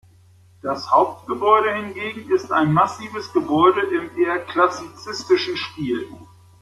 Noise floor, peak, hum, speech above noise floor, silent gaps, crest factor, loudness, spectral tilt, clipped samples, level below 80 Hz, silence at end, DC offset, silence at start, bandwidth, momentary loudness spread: -51 dBFS; -2 dBFS; none; 31 dB; none; 18 dB; -20 LUFS; -6 dB/octave; under 0.1%; -60 dBFS; 0.35 s; under 0.1%; 0.65 s; 12 kHz; 13 LU